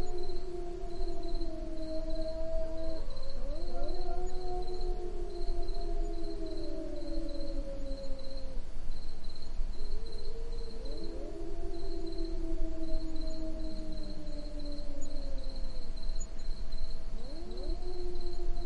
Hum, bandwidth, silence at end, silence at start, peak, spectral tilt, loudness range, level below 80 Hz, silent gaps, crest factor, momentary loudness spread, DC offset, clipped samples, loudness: none; 7.4 kHz; 0 s; 0 s; -16 dBFS; -6 dB/octave; 4 LU; -34 dBFS; none; 12 dB; 5 LU; under 0.1%; under 0.1%; -42 LUFS